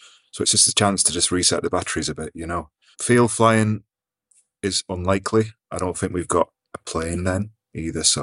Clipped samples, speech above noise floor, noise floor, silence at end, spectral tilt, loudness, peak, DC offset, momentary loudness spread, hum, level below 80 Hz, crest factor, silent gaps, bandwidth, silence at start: under 0.1%; 44 dB; -65 dBFS; 0 s; -3.5 dB/octave; -21 LUFS; -2 dBFS; under 0.1%; 14 LU; none; -50 dBFS; 20 dB; none; 12 kHz; 0.35 s